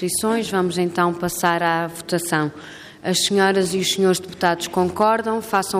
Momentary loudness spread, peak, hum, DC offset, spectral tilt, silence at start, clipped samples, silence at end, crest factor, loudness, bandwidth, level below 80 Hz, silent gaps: 6 LU; -4 dBFS; none; under 0.1%; -4 dB/octave; 0 s; under 0.1%; 0 s; 16 dB; -20 LUFS; 15.5 kHz; -58 dBFS; none